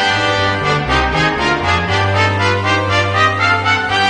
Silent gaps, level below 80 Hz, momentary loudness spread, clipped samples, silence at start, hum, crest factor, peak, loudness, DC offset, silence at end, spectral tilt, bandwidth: none; -32 dBFS; 2 LU; under 0.1%; 0 s; none; 14 dB; 0 dBFS; -14 LUFS; under 0.1%; 0 s; -4.5 dB/octave; 10 kHz